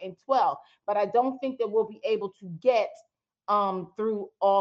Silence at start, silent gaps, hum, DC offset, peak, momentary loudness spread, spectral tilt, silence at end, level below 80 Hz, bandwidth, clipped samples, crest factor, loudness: 0 s; none; none; under 0.1%; -10 dBFS; 6 LU; -6.5 dB/octave; 0 s; -80 dBFS; 7.6 kHz; under 0.1%; 16 dB; -28 LUFS